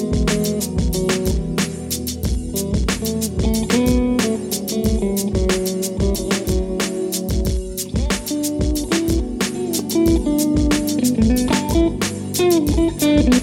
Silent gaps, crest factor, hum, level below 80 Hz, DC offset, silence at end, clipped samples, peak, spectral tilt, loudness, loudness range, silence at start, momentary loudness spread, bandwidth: none; 16 dB; none; -26 dBFS; under 0.1%; 0 s; under 0.1%; -2 dBFS; -5 dB/octave; -19 LUFS; 4 LU; 0 s; 6 LU; 17.5 kHz